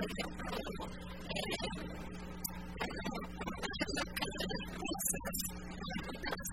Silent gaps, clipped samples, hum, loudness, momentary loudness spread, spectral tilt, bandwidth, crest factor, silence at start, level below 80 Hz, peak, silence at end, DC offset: none; under 0.1%; none; -40 LUFS; 8 LU; -3.5 dB/octave; 16 kHz; 20 dB; 0 s; -52 dBFS; -20 dBFS; 0 s; 0.2%